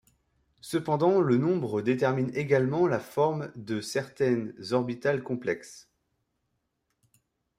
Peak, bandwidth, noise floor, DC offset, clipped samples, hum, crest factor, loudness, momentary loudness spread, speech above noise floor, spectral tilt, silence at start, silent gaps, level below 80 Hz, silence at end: -10 dBFS; 15.5 kHz; -79 dBFS; under 0.1%; under 0.1%; none; 18 dB; -28 LUFS; 10 LU; 52 dB; -6.5 dB/octave; 0.65 s; none; -68 dBFS; 1.8 s